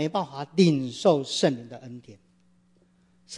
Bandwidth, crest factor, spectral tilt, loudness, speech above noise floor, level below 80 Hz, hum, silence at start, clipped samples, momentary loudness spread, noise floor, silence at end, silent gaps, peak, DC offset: 11 kHz; 20 dB; -5.5 dB/octave; -24 LUFS; 38 dB; -72 dBFS; none; 0 s; under 0.1%; 21 LU; -63 dBFS; 0 s; none; -6 dBFS; under 0.1%